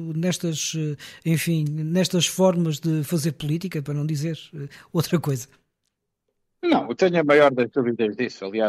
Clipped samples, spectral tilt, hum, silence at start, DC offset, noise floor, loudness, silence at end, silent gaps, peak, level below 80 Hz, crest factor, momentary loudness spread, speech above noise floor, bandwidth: under 0.1%; -5.5 dB/octave; none; 0 s; under 0.1%; -78 dBFS; -23 LUFS; 0 s; none; -6 dBFS; -64 dBFS; 16 dB; 11 LU; 55 dB; 15.5 kHz